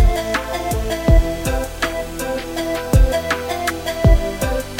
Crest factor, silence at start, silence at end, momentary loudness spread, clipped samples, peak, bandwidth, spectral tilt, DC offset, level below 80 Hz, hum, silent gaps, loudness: 16 dB; 0 s; 0 s; 7 LU; under 0.1%; 0 dBFS; 17 kHz; -5.5 dB/octave; under 0.1%; -20 dBFS; none; none; -19 LUFS